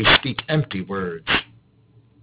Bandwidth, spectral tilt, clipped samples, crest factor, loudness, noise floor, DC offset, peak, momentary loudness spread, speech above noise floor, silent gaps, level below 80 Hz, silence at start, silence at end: 4 kHz; -8.5 dB/octave; under 0.1%; 20 dB; -21 LUFS; -55 dBFS; under 0.1%; -2 dBFS; 11 LU; 34 dB; none; -44 dBFS; 0 s; 0.8 s